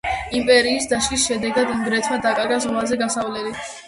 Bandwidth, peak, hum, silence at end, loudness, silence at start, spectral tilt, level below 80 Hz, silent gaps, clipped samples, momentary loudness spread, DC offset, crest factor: 11.5 kHz; -2 dBFS; none; 0 s; -20 LUFS; 0.05 s; -2.5 dB/octave; -46 dBFS; none; under 0.1%; 8 LU; under 0.1%; 18 dB